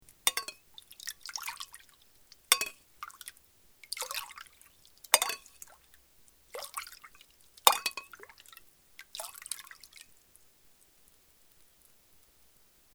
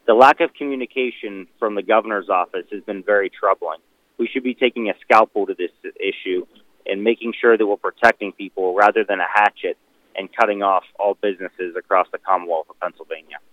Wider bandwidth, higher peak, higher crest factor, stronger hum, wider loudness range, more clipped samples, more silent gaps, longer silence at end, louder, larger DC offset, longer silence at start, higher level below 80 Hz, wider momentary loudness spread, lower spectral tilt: first, over 20 kHz vs 11.5 kHz; about the same, 0 dBFS vs 0 dBFS; first, 38 dB vs 20 dB; neither; first, 15 LU vs 3 LU; neither; neither; first, 2.95 s vs 0.15 s; second, -32 LUFS vs -19 LUFS; neither; first, 0.25 s vs 0.05 s; second, -74 dBFS vs -68 dBFS; first, 27 LU vs 14 LU; second, 2.5 dB/octave vs -5 dB/octave